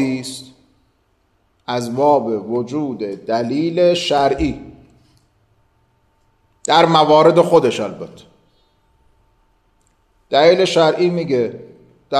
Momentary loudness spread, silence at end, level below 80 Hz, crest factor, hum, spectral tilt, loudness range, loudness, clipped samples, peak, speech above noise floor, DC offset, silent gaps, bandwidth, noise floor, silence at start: 18 LU; 0 s; -46 dBFS; 18 dB; none; -5.5 dB/octave; 5 LU; -16 LUFS; under 0.1%; 0 dBFS; 46 dB; under 0.1%; none; 13 kHz; -62 dBFS; 0 s